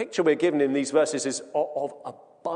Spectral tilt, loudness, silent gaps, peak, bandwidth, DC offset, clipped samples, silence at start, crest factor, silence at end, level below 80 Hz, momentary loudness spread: -4 dB/octave; -25 LUFS; none; -8 dBFS; 10 kHz; under 0.1%; under 0.1%; 0 s; 16 dB; 0 s; -72 dBFS; 14 LU